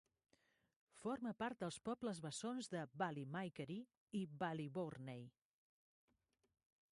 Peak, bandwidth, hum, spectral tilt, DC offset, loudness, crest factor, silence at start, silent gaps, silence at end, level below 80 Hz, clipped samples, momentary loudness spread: -28 dBFS; 11.5 kHz; none; -5.5 dB/octave; under 0.1%; -48 LUFS; 20 dB; 0.95 s; 3.97-4.07 s; 1.65 s; -84 dBFS; under 0.1%; 7 LU